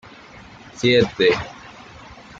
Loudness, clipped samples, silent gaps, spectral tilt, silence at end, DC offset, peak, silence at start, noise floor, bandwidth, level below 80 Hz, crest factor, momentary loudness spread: -18 LUFS; under 0.1%; none; -5 dB/octave; 0.25 s; under 0.1%; -4 dBFS; 0.75 s; -43 dBFS; 7.8 kHz; -50 dBFS; 18 dB; 24 LU